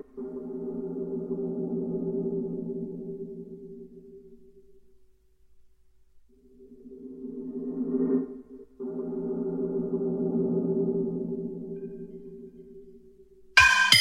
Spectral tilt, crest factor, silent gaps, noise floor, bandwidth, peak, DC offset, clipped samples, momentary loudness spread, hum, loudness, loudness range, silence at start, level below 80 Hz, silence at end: -3.5 dB/octave; 26 dB; none; -58 dBFS; 16 kHz; -4 dBFS; under 0.1%; under 0.1%; 19 LU; none; -28 LUFS; 16 LU; 0.15 s; -58 dBFS; 0 s